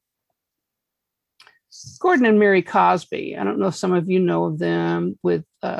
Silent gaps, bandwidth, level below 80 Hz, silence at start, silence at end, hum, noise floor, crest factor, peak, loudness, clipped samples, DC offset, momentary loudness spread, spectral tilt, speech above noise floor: none; 11.5 kHz; -64 dBFS; 1.75 s; 0 s; none; -82 dBFS; 16 dB; -4 dBFS; -20 LUFS; under 0.1%; under 0.1%; 9 LU; -6.5 dB/octave; 63 dB